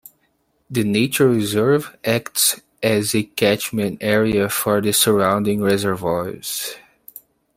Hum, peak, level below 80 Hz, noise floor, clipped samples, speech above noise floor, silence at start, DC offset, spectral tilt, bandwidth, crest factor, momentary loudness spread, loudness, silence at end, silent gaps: none; -2 dBFS; -54 dBFS; -65 dBFS; under 0.1%; 47 dB; 0.7 s; under 0.1%; -4 dB/octave; 16.5 kHz; 16 dB; 9 LU; -19 LUFS; 0.8 s; none